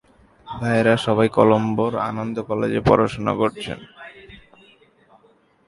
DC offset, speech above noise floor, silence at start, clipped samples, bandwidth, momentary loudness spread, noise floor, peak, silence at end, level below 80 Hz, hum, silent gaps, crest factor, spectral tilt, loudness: under 0.1%; 38 dB; 0.45 s; under 0.1%; 11.5 kHz; 19 LU; -57 dBFS; 0 dBFS; 1.3 s; -48 dBFS; none; none; 22 dB; -7 dB/octave; -20 LUFS